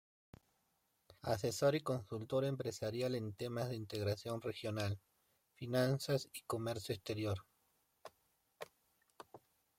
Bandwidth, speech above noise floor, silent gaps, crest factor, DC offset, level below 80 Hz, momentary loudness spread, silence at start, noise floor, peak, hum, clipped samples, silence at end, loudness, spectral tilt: 16.5 kHz; 42 dB; none; 20 dB; under 0.1%; -74 dBFS; 22 LU; 1.25 s; -81 dBFS; -22 dBFS; none; under 0.1%; 0.4 s; -40 LUFS; -5.5 dB/octave